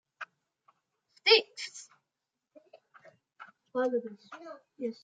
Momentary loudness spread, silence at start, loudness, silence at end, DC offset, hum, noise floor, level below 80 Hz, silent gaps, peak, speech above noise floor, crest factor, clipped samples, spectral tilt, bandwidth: 25 LU; 0.2 s; -29 LUFS; 0.1 s; under 0.1%; none; -87 dBFS; under -90 dBFS; none; -8 dBFS; 52 dB; 26 dB; under 0.1%; -1.5 dB/octave; 9.2 kHz